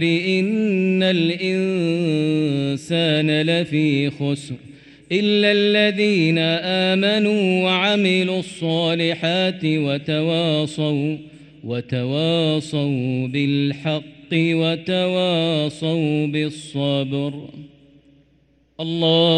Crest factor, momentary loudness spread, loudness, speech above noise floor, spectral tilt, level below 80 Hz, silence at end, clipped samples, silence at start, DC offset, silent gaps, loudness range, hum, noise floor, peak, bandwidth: 14 dB; 8 LU; -19 LUFS; 39 dB; -6.5 dB/octave; -62 dBFS; 0 s; under 0.1%; 0 s; under 0.1%; none; 4 LU; none; -59 dBFS; -4 dBFS; 9.4 kHz